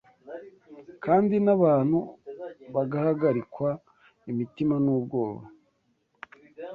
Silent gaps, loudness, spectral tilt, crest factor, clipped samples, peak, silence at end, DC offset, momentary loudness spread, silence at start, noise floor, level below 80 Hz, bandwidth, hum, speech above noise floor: none; -26 LUFS; -11 dB/octave; 18 dB; under 0.1%; -8 dBFS; 0 s; under 0.1%; 22 LU; 0.25 s; -71 dBFS; -66 dBFS; 4.9 kHz; none; 47 dB